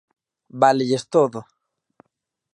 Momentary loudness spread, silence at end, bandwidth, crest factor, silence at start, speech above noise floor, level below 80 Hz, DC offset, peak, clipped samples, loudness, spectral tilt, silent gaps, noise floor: 18 LU; 1.1 s; 11 kHz; 20 dB; 0.55 s; 58 dB; -74 dBFS; under 0.1%; -2 dBFS; under 0.1%; -19 LUFS; -5.5 dB/octave; none; -77 dBFS